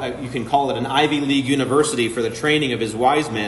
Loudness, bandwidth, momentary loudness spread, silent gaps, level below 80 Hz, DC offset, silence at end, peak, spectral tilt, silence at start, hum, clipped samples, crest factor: -19 LUFS; 11.5 kHz; 4 LU; none; -52 dBFS; under 0.1%; 0 s; -4 dBFS; -4.5 dB/octave; 0 s; none; under 0.1%; 16 dB